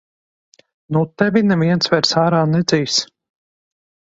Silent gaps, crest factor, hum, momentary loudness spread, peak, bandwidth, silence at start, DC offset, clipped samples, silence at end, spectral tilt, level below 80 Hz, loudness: none; 18 dB; none; 6 LU; 0 dBFS; 8 kHz; 0.9 s; under 0.1%; under 0.1%; 1.1 s; -5 dB/octave; -56 dBFS; -16 LUFS